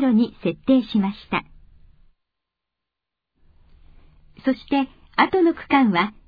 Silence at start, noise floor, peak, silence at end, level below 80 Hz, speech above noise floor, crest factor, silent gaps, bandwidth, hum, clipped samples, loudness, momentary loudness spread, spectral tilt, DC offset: 0 s; -85 dBFS; -2 dBFS; 0.15 s; -52 dBFS; 65 dB; 22 dB; none; 5 kHz; none; under 0.1%; -21 LUFS; 9 LU; -8.5 dB/octave; under 0.1%